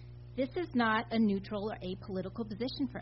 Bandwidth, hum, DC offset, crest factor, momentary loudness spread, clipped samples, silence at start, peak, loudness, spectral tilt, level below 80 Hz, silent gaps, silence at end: 5.8 kHz; 60 Hz at -50 dBFS; under 0.1%; 18 dB; 10 LU; under 0.1%; 0 s; -16 dBFS; -34 LUFS; -4.5 dB/octave; -56 dBFS; none; 0 s